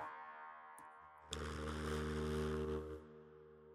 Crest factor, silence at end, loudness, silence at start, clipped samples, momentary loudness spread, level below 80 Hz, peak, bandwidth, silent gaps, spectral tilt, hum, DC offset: 20 dB; 0 s; -45 LUFS; 0 s; under 0.1%; 19 LU; -54 dBFS; -26 dBFS; 14.5 kHz; none; -5.5 dB/octave; none; under 0.1%